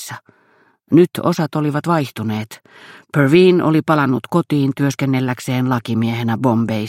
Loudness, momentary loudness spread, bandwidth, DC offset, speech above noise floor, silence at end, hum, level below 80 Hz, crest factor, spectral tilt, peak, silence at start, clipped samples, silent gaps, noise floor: -17 LUFS; 11 LU; 16 kHz; under 0.1%; 39 dB; 0 s; none; -60 dBFS; 16 dB; -7 dB/octave; 0 dBFS; 0 s; under 0.1%; none; -56 dBFS